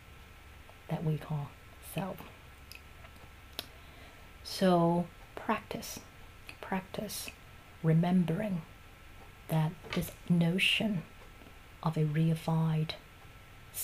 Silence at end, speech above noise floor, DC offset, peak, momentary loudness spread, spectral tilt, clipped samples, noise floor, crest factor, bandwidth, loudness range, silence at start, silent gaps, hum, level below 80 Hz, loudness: 0 s; 22 dB; under 0.1%; -16 dBFS; 26 LU; -6 dB/octave; under 0.1%; -53 dBFS; 20 dB; 15.5 kHz; 9 LU; 0.1 s; none; none; -56 dBFS; -33 LUFS